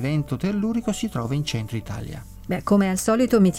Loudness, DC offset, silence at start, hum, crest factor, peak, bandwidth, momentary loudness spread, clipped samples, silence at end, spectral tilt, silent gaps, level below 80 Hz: -23 LUFS; under 0.1%; 0 s; none; 16 dB; -6 dBFS; 17 kHz; 14 LU; under 0.1%; 0 s; -6 dB/octave; none; -44 dBFS